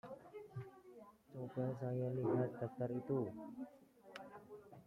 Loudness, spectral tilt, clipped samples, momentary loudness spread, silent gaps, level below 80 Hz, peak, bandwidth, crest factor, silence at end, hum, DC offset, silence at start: -44 LUFS; -9.5 dB/octave; under 0.1%; 18 LU; none; -80 dBFS; -28 dBFS; 10.5 kHz; 18 dB; 0.05 s; none; under 0.1%; 0.05 s